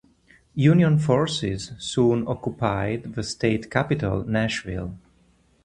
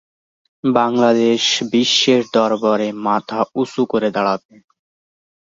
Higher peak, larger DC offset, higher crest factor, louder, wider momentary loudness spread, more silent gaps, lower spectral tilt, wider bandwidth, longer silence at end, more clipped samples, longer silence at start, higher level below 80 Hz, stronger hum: about the same, -2 dBFS vs -2 dBFS; neither; about the same, 20 dB vs 16 dB; second, -23 LUFS vs -16 LUFS; first, 12 LU vs 7 LU; neither; first, -6.5 dB/octave vs -4 dB/octave; first, 11 kHz vs 7.8 kHz; second, 0.65 s vs 1.2 s; neither; about the same, 0.55 s vs 0.65 s; first, -46 dBFS vs -64 dBFS; neither